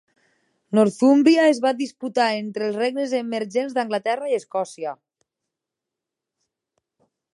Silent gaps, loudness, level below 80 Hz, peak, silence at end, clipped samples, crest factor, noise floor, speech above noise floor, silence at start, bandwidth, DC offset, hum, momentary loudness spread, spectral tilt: none; -21 LUFS; -78 dBFS; -4 dBFS; 2.4 s; under 0.1%; 18 dB; -86 dBFS; 65 dB; 0.7 s; 11.5 kHz; under 0.1%; none; 11 LU; -5 dB/octave